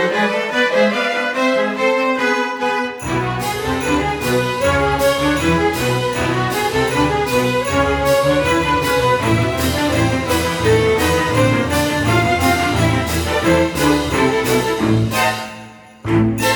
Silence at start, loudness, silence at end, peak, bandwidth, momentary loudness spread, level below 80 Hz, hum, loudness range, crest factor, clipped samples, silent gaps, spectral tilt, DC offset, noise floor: 0 s; -16 LUFS; 0 s; -2 dBFS; over 20 kHz; 4 LU; -34 dBFS; none; 2 LU; 14 dB; under 0.1%; none; -5 dB/octave; under 0.1%; -37 dBFS